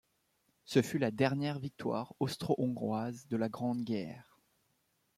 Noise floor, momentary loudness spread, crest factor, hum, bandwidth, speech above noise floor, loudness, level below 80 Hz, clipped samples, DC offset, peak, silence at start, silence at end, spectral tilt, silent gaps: -77 dBFS; 7 LU; 22 dB; none; 15.5 kHz; 43 dB; -35 LUFS; -72 dBFS; under 0.1%; under 0.1%; -14 dBFS; 0.7 s; 0.95 s; -6.5 dB/octave; none